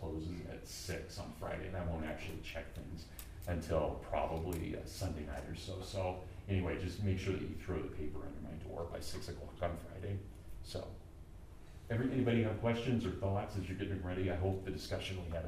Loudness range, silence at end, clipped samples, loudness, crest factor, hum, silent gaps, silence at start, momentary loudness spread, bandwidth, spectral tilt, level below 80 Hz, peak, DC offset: 8 LU; 0 s; under 0.1%; -41 LUFS; 18 dB; none; none; 0 s; 12 LU; 15.5 kHz; -6.5 dB/octave; -52 dBFS; -22 dBFS; under 0.1%